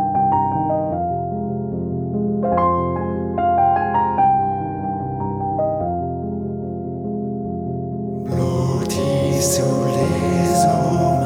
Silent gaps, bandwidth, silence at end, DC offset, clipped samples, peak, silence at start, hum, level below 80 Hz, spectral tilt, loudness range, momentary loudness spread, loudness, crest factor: none; 17 kHz; 0 s; under 0.1%; under 0.1%; -4 dBFS; 0 s; none; -44 dBFS; -6.5 dB/octave; 5 LU; 9 LU; -20 LUFS; 14 dB